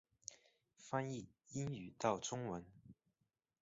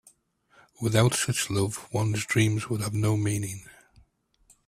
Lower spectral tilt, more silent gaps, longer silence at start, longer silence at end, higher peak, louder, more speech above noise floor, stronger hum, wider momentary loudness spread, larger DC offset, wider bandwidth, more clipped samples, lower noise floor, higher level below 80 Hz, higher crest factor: about the same, -5.5 dB/octave vs -5 dB/octave; neither; second, 0.3 s vs 0.8 s; second, 0.7 s vs 0.95 s; second, -22 dBFS vs -6 dBFS; second, -45 LUFS vs -26 LUFS; first, 44 dB vs 38 dB; neither; first, 18 LU vs 9 LU; neither; second, 8 kHz vs 15 kHz; neither; first, -88 dBFS vs -64 dBFS; second, -76 dBFS vs -56 dBFS; about the same, 24 dB vs 22 dB